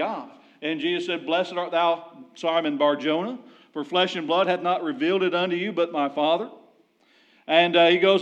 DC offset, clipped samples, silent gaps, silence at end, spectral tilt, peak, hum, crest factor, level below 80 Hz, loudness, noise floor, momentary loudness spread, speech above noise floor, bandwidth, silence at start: under 0.1%; under 0.1%; none; 0 s; -5.5 dB/octave; -6 dBFS; none; 18 dB; under -90 dBFS; -23 LUFS; -61 dBFS; 15 LU; 38 dB; 8.4 kHz; 0 s